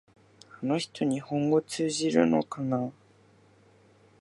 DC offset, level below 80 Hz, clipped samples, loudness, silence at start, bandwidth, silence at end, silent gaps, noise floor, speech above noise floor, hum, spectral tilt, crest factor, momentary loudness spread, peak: under 0.1%; -74 dBFS; under 0.1%; -28 LUFS; 0.6 s; 11.5 kHz; 1.3 s; none; -60 dBFS; 33 dB; none; -5.5 dB/octave; 22 dB; 7 LU; -8 dBFS